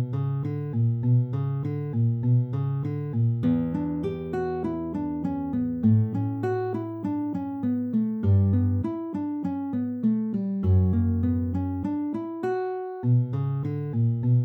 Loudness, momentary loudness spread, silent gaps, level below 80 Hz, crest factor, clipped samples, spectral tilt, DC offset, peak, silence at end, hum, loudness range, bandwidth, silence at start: -26 LUFS; 7 LU; none; -52 dBFS; 14 dB; under 0.1%; -11.5 dB/octave; under 0.1%; -12 dBFS; 0 s; none; 2 LU; 4.3 kHz; 0 s